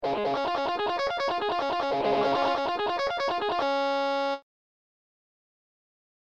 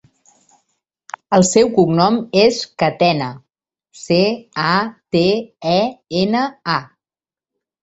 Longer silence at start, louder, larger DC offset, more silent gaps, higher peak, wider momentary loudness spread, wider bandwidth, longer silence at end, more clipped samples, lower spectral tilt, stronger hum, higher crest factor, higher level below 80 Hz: second, 0 s vs 1.3 s; second, -27 LUFS vs -16 LUFS; neither; neither; second, -14 dBFS vs 0 dBFS; second, 3 LU vs 9 LU; about the same, 8.8 kHz vs 8.2 kHz; first, 1.95 s vs 1 s; neither; about the same, -4.5 dB/octave vs -5 dB/octave; neither; about the same, 14 dB vs 18 dB; second, -62 dBFS vs -54 dBFS